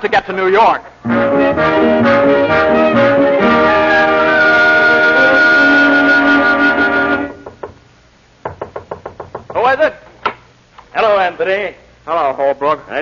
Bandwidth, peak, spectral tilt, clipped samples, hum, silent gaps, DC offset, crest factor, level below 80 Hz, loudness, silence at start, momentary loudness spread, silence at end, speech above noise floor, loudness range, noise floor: 7.2 kHz; -2 dBFS; -6 dB/octave; under 0.1%; none; none; under 0.1%; 10 dB; -44 dBFS; -11 LUFS; 0 s; 18 LU; 0 s; 35 dB; 10 LU; -47 dBFS